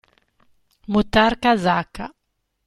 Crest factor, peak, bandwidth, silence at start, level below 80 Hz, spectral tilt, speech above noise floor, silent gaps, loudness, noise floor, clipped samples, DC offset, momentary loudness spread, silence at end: 18 dB; -4 dBFS; 13 kHz; 0.9 s; -42 dBFS; -6 dB/octave; 55 dB; none; -19 LUFS; -74 dBFS; under 0.1%; under 0.1%; 19 LU; 0.6 s